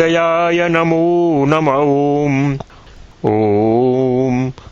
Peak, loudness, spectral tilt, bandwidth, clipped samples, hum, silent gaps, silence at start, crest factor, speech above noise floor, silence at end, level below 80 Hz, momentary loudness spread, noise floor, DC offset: 0 dBFS; -14 LUFS; -7.5 dB/octave; 7.4 kHz; under 0.1%; none; none; 0 s; 14 dB; 25 dB; 0.2 s; -44 dBFS; 5 LU; -39 dBFS; under 0.1%